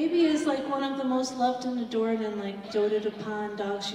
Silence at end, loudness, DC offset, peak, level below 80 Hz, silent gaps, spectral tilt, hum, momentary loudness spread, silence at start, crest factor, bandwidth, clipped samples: 0 s; -29 LUFS; under 0.1%; -14 dBFS; -68 dBFS; none; -4.5 dB/octave; none; 8 LU; 0 s; 14 dB; 11.5 kHz; under 0.1%